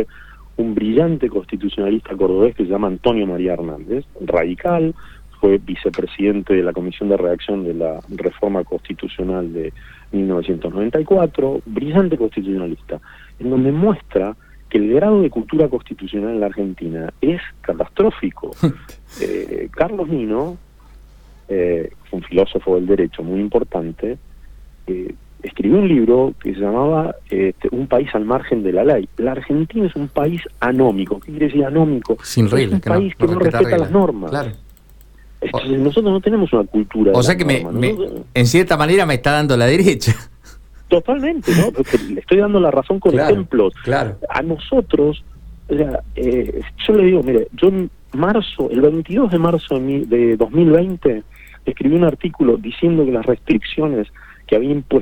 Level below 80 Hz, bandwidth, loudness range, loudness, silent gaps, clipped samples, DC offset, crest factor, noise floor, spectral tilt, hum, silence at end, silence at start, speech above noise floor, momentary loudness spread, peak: -38 dBFS; 17.5 kHz; 5 LU; -17 LUFS; none; under 0.1%; under 0.1%; 16 dB; -44 dBFS; -7 dB/octave; none; 0 s; 0 s; 27 dB; 11 LU; 0 dBFS